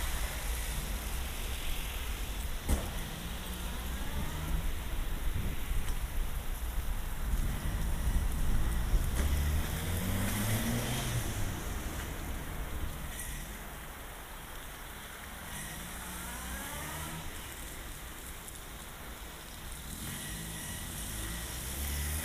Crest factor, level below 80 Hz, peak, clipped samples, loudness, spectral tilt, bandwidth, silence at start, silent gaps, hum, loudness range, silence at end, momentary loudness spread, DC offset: 18 dB; -36 dBFS; -16 dBFS; under 0.1%; -38 LUFS; -4 dB/octave; 15.5 kHz; 0 s; none; none; 9 LU; 0 s; 11 LU; under 0.1%